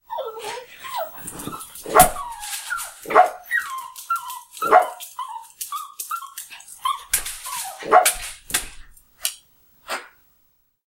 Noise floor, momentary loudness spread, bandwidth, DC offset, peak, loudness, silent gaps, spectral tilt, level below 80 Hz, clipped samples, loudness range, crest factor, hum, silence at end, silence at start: -63 dBFS; 17 LU; 17 kHz; under 0.1%; 0 dBFS; -22 LUFS; none; -1.5 dB/octave; -44 dBFS; under 0.1%; 3 LU; 24 dB; none; 0.8 s; 0.1 s